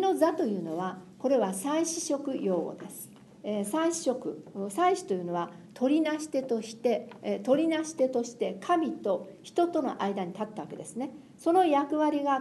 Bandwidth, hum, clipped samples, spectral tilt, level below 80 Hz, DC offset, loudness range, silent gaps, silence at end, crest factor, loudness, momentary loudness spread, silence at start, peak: 12 kHz; none; under 0.1%; -5 dB/octave; -78 dBFS; under 0.1%; 2 LU; none; 0 s; 18 dB; -30 LUFS; 12 LU; 0 s; -12 dBFS